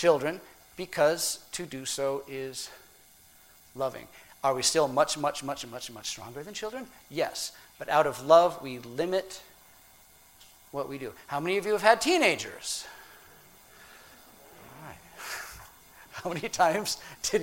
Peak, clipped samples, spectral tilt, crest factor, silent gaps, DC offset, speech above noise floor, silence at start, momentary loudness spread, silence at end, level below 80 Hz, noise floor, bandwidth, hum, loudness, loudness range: -4 dBFS; under 0.1%; -2.5 dB/octave; 26 dB; none; under 0.1%; 29 dB; 0 s; 21 LU; 0 s; -64 dBFS; -57 dBFS; 16.5 kHz; none; -29 LUFS; 8 LU